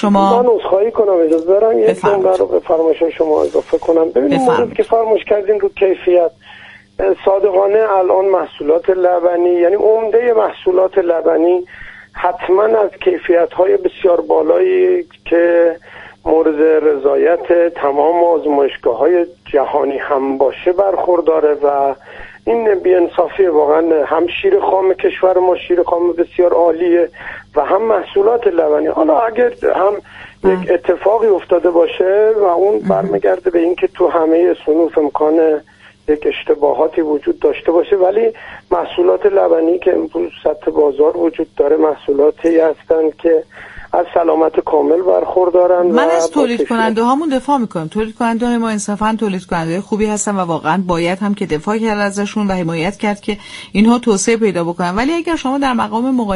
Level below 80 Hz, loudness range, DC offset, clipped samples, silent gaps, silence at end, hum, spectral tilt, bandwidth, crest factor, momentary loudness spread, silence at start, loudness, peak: -46 dBFS; 3 LU; under 0.1%; under 0.1%; none; 0 s; none; -5.5 dB/octave; 11.5 kHz; 12 dB; 6 LU; 0 s; -14 LUFS; 0 dBFS